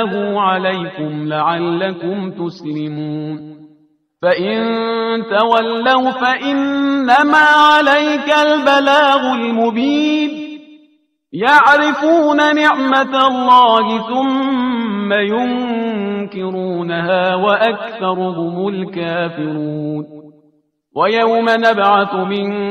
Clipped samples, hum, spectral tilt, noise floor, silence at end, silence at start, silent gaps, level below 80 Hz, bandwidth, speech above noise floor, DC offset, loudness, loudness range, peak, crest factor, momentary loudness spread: under 0.1%; none; -5.5 dB/octave; -57 dBFS; 0 s; 0 s; none; -62 dBFS; 11 kHz; 43 dB; under 0.1%; -14 LUFS; 9 LU; 0 dBFS; 14 dB; 13 LU